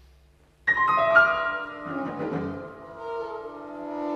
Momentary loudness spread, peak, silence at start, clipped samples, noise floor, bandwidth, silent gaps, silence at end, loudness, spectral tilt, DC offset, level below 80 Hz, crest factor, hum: 19 LU; -6 dBFS; 0.65 s; under 0.1%; -58 dBFS; 8.4 kHz; none; 0 s; -25 LUFS; -6 dB/octave; under 0.1%; -60 dBFS; 22 dB; none